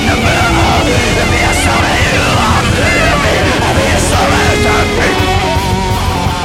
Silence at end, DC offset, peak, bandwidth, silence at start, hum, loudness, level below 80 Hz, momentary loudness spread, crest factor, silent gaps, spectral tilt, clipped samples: 0 s; under 0.1%; 0 dBFS; 16.5 kHz; 0 s; none; -10 LUFS; -20 dBFS; 3 LU; 10 dB; none; -4.5 dB/octave; under 0.1%